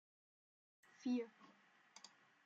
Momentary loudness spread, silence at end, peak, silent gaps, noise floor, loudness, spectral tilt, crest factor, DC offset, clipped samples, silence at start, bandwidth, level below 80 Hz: 24 LU; 0.4 s; -32 dBFS; none; -71 dBFS; -46 LUFS; -4.5 dB/octave; 18 dB; under 0.1%; under 0.1%; 1 s; 8 kHz; under -90 dBFS